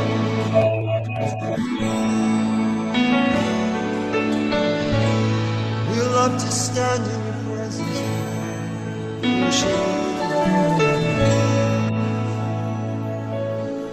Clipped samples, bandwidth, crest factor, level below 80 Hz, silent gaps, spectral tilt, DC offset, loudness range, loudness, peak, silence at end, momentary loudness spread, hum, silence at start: under 0.1%; 13 kHz; 16 dB; -46 dBFS; none; -5.5 dB/octave; under 0.1%; 3 LU; -21 LUFS; -4 dBFS; 0 s; 8 LU; none; 0 s